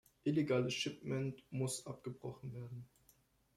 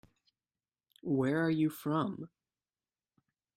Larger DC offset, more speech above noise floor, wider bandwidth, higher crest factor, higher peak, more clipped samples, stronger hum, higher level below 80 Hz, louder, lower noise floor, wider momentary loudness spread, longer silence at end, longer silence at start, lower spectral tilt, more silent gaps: neither; second, 33 dB vs over 58 dB; about the same, 15 kHz vs 16 kHz; about the same, 18 dB vs 16 dB; second, -24 dBFS vs -20 dBFS; neither; neither; about the same, -74 dBFS vs -74 dBFS; second, -40 LUFS vs -33 LUFS; second, -73 dBFS vs under -90 dBFS; about the same, 14 LU vs 16 LU; second, 0.7 s vs 1.3 s; second, 0.25 s vs 1.05 s; second, -5.5 dB/octave vs -7.5 dB/octave; neither